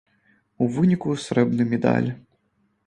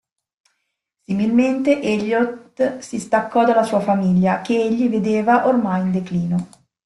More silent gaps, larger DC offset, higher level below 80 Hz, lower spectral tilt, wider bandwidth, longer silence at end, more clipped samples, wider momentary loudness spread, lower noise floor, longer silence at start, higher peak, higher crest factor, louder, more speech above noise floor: neither; neither; about the same, -60 dBFS vs -58 dBFS; about the same, -7.5 dB/octave vs -7 dB/octave; second, 10 kHz vs 11.5 kHz; first, 0.7 s vs 0.4 s; neither; about the same, 6 LU vs 7 LU; second, -68 dBFS vs -75 dBFS; second, 0.6 s vs 1.1 s; about the same, -4 dBFS vs -4 dBFS; about the same, 20 dB vs 16 dB; second, -22 LUFS vs -19 LUFS; second, 47 dB vs 57 dB